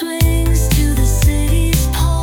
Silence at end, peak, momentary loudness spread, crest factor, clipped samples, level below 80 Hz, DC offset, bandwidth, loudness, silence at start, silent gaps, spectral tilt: 0 s; -2 dBFS; 2 LU; 12 dB; under 0.1%; -16 dBFS; under 0.1%; 18 kHz; -15 LUFS; 0 s; none; -5 dB/octave